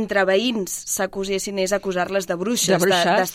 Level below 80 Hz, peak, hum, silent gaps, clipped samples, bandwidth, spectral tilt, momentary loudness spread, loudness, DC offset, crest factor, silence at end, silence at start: -52 dBFS; -6 dBFS; none; none; under 0.1%; 16 kHz; -3 dB/octave; 7 LU; -21 LUFS; under 0.1%; 16 dB; 0 s; 0 s